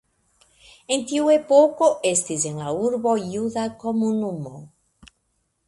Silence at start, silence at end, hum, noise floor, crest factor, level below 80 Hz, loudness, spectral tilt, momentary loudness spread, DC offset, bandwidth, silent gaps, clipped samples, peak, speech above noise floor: 0.9 s; 1 s; none; -71 dBFS; 20 dB; -62 dBFS; -21 LUFS; -4.5 dB/octave; 10 LU; under 0.1%; 11.5 kHz; none; under 0.1%; -4 dBFS; 50 dB